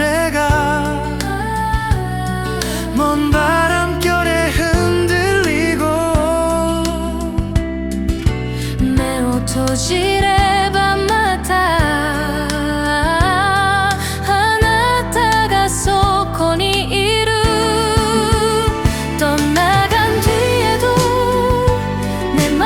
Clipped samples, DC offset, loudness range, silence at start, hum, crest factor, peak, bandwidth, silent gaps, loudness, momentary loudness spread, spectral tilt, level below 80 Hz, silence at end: under 0.1%; under 0.1%; 3 LU; 0 s; none; 14 dB; -2 dBFS; 18 kHz; none; -15 LUFS; 6 LU; -4.5 dB/octave; -26 dBFS; 0 s